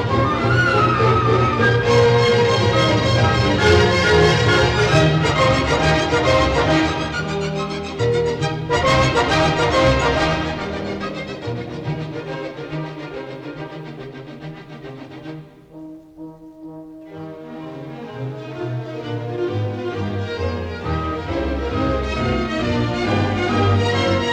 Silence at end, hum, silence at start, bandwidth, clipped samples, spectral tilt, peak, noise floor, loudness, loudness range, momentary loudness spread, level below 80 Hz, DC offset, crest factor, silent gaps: 0 s; none; 0 s; 10.5 kHz; under 0.1%; -5.5 dB/octave; -2 dBFS; -38 dBFS; -18 LUFS; 19 LU; 20 LU; -36 dBFS; under 0.1%; 16 dB; none